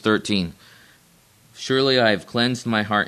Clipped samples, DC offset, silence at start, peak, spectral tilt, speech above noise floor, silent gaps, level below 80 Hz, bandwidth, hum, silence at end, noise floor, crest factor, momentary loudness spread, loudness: under 0.1%; under 0.1%; 0.05 s; -4 dBFS; -5 dB/octave; 35 dB; none; -58 dBFS; 13.5 kHz; none; 0 s; -55 dBFS; 18 dB; 9 LU; -20 LUFS